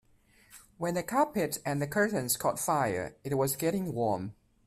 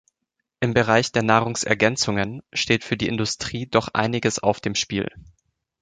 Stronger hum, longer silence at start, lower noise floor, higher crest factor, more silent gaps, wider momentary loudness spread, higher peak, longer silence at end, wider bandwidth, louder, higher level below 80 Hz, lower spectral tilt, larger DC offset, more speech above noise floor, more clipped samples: neither; about the same, 0.5 s vs 0.6 s; second, -63 dBFS vs -79 dBFS; about the same, 18 dB vs 22 dB; neither; about the same, 6 LU vs 7 LU; second, -14 dBFS vs -2 dBFS; second, 0.35 s vs 0.6 s; first, 16 kHz vs 9.6 kHz; second, -31 LUFS vs -22 LUFS; second, -62 dBFS vs -50 dBFS; about the same, -4.5 dB/octave vs -4 dB/octave; neither; second, 33 dB vs 57 dB; neither